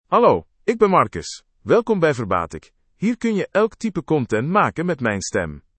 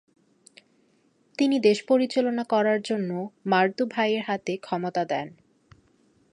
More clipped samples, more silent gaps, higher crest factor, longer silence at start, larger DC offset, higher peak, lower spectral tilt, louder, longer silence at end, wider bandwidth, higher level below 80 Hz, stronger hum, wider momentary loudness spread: neither; neither; about the same, 18 dB vs 20 dB; second, 0.1 s vs 1.4 s; neither; first, -2 dBFS vs -6 dBFS; about the same, -6 dB/octave vs -5.5 dB/octave; first, -20 LUFS vs -25 LUFS; second, 0.2 s vs 1.05 s; second, 8.8 kHz vs 11 kHz; first, -52 dBFS vs -74 dBFS; neither; about the same, 10 LU vs 9 LU